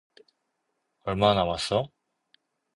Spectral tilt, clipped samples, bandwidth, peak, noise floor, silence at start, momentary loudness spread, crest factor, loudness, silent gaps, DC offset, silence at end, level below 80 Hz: -5 dB/octave; under 0.1%; 11.5 kHz; -6 dBFS; -78 dBFS; 1.05 s; 15 LU; 24 dB; -25 LUFS; none; under 0.1%; 0.9 s; -52 dBFS